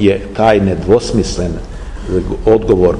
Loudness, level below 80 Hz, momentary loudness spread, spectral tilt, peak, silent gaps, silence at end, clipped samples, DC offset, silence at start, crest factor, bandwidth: -13 LUFS; -26 dBFS; 13 LU; -6.5 dB/octave; 0 dBFS; none; 0 s; under 0.1%; 0.6%; 0 s; 12 dB; 10.5 kHz